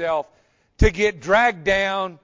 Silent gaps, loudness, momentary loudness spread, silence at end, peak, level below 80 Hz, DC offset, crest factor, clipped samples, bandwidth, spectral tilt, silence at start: none; -20 LUFS; 8 LU; 0.1 s; -4 dBFS; -30 dBFS; under 0.1%; 16 dB; under 0.1%; 7.6 kHz; -5 dB/octave; 0 s